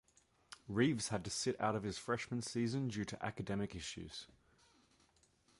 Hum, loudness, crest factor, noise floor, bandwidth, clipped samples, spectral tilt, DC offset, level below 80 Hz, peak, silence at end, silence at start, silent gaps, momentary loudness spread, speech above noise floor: none; -40 LUFS; 20 dB; -73 dBFS; 11.5 kHz; under 0.1%; -5 dB/octave; under 0.1%; -66 dBFS; -20 dBFS; 1.35 s; 0.5 s; none; 15 LU; 33 dB